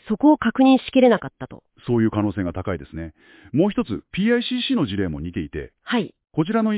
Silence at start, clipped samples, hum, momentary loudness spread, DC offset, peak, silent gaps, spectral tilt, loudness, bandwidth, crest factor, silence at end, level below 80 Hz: 0.05 s; under 0.1%; none; 18 LU; under 0.1%; -4 dBFS; none; -11 dB/octave; -21 LUFS; 4 kHz; 16 dB; 0 s; -44 dBFS